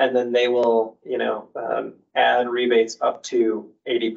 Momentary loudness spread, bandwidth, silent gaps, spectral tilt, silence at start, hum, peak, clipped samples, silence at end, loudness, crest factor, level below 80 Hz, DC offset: 9 LU; 7.8 kHz; none; -3.5 dB/octave; 0 s; none; -6 dBFS; under 0.1%; 0 s; -22 LUFS; 16 dB; -76 dBFS; under 0.1%